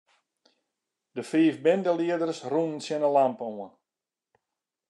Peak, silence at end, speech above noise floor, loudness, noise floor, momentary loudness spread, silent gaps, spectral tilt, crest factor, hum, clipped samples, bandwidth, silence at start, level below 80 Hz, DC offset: -10 dBFS; 1.2 s; over 64 dB; -26 LUFS; under -90 dBFS; 16 LU; none; -6 dB/octave; 18 dB; none; under 0.1%; 11 kHz; 1.15 s; -88 dBFS; under 0.1%